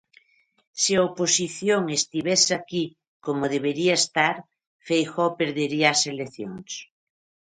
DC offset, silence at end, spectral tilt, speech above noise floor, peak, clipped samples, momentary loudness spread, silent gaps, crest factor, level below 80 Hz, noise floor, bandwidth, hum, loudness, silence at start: under 0.1%; 0.7 s; -2.5 dB/octave; 37 dB; -4 dBFS; under 0.1%; 15 LU; 3.08-3.20 s, 4.67-4.79 s; 20 dB; -68 dBFS; -60 dBFS; 11 kHz; none; -23 LUFS; 0.75 s